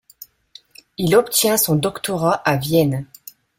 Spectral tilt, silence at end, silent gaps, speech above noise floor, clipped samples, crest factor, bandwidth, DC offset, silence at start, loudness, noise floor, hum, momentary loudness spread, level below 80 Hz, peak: -4.5 dB/octave; 0.55 s; none; 31 dB; under 0.1%; 18 dB; 16.5 kHz; under 0.1%; 1 s; -18 LUFS; -48 dBFS; none; 11 LU; -54 dBFS; -2 dBFS